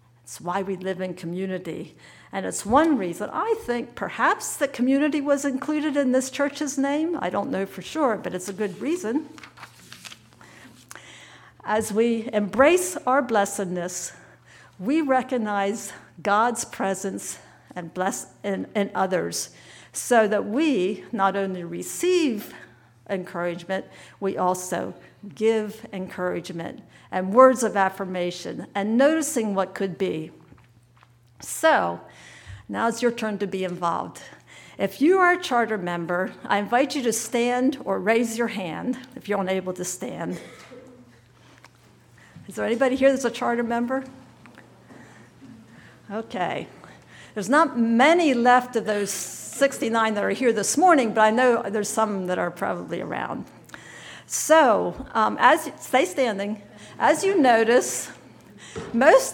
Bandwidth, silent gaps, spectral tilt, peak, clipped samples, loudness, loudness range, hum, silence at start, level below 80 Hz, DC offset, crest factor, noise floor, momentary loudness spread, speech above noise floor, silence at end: 19 kHz; none; -4 dB/octave; -2 dBFS; under 0.1%; -23 LUFS; 8 LU; none; 0.25 s; -62 dBFS; under 0.1%; 22 dB; -56 dBFS; 17 LU; 33 dB; 0 s